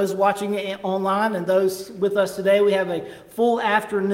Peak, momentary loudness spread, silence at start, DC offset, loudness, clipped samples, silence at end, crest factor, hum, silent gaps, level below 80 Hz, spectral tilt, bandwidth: -6 dBFS; 8 LU; 0 s; under 0.1%; -21 LUFS; under 0.1%; 0 s; 16 dB; none; none; -64 dBFS; -5 dB/octave; 16.5 kHz